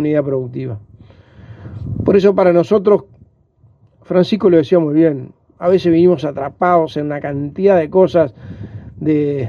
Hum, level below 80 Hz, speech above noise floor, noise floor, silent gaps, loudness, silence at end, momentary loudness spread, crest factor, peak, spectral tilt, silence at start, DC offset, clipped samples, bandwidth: none; -48 dBFS; 38 dB; -52 dBFS; none; -14 LUFS; 0 s; 16 LU; 14 dB; 0 dBFS; -9 dB/octave; 0 s; under 0.1%; under 0.1%; 7 kHz